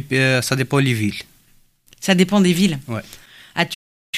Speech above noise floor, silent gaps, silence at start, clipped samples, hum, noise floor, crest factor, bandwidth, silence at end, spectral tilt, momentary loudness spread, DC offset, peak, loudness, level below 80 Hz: 37 dB; 3.75-4.13 s; 0 s; under 0.1%; none; -55 dBFS; 18 dB; 15.5 kHz; 0 s; -5 dB/octave; 14 LU; under 0.1%; 0 dBFS; -18 LUFS; -52 dBFS